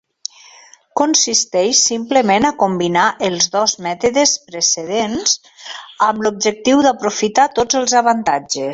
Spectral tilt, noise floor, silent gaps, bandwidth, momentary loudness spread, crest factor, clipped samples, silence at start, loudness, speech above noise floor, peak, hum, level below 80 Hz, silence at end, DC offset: -2 dB/octave; -45 dBFS; none; 8 kHz; 6 LU; 16 dB; under 0.1%; 0.95 s; -15 LUFS; 29 dB; 0 dBFS; none; -54 dBFS; 0 s; under 0.1%